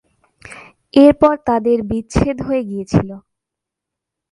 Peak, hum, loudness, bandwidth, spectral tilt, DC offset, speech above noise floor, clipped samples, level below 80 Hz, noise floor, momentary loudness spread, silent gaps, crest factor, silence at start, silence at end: 0 dBFS; none; -15 LUFS; 11.5 kHz; -7.5 dB/octave; under 0.1%; 68 dB; under 0.1%; -36 dBFS; -83 dBFS; 14 LU; none; 16 dB; 0.5 s; 1.15 s